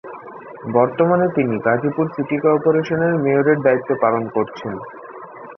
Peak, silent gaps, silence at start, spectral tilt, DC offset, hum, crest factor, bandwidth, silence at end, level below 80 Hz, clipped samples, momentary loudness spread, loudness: -2 dBFS; none; 0.05 s; -9 dB/octave; under 0.1%; none; 16 dB; 6.2 kHz; 0.05 s; -58 dBFS; under 0.1%; 19 LU; -18 LUFS